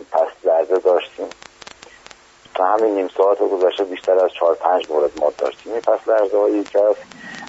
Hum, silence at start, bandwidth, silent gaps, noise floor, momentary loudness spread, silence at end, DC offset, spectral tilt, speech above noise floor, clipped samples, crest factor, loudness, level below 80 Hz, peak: none; 0 s; 8 kHz; none; -45 dBFS; 13 LU; 0 s; under 0.1%; -1.5 dB/octave; 28 dB; under 0.1%; 16 dB; -18 LUFS; -64 dBFS; -2 dBFS